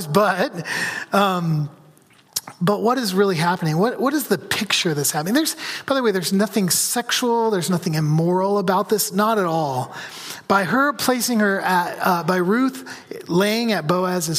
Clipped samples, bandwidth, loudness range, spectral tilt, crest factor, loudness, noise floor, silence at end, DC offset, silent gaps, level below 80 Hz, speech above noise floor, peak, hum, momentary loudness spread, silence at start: under 0.1%; 15.5 kHz; 2 LU; -4 dB/octave; 18 dB; -20 LUFS; -52 dBFS; 0 s; under 0.1%; none; -66 dBFS; 32 dB; -2 dBFS; none; 7 LU; 0 s